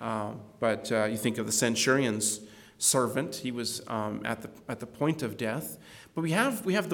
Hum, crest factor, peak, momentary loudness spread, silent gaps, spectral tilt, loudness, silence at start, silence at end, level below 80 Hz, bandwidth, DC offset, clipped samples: none; 20 dB; -10 dBFS; 14 LU; none; -3.5 dB/octave; -29 LUFS; 0 s; 0 s; -68 dBFS; 19 kHz; under 0.1%; under 0.1%